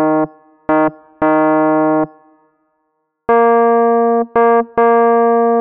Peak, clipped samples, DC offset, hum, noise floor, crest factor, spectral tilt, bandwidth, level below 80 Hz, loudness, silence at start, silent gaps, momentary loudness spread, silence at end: -2 dBFS; under 0.1%; under 0.1%; none; -68 dBFS; 10 dB; -6.5 dB/octave; 3.5 kHz; -54 dBFS; -13 LUFS; 0 s; none; 8 LU; 0 s